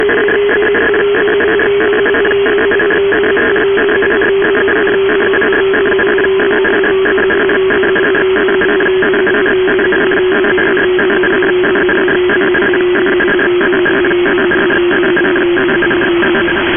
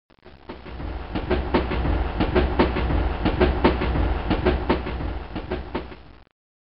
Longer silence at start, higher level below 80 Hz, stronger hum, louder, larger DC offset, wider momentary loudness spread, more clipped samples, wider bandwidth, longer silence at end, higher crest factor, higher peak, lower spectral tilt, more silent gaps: about the same, 0 s vs 0.1 s; second, -38 dBFS vs -28 dBFS; neither; first, -10 LUFS vs -24 LUFS; second, under 0.1% vs 0.8%; second, 0 LU vs 14 LU; neither; second, 3.6 kHz vs 5.6 kHz; second, 0 s vs 0.3 s; second, 10 dB vs 18 dB; first, -2 dBFS vs -6 dBFS; second, -2.5 dB/octave vs -5.5 dB/octave; neither